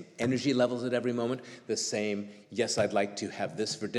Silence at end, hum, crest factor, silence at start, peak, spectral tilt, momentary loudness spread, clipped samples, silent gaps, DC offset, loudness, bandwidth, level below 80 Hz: 0 s; none; 18 dB; 0 s; -14 dBFS; -4 dB/octave; 8 LU; under 0.1%; none; under 0.1%; -31 LUFS; 12.5 kHz; -74 dBFS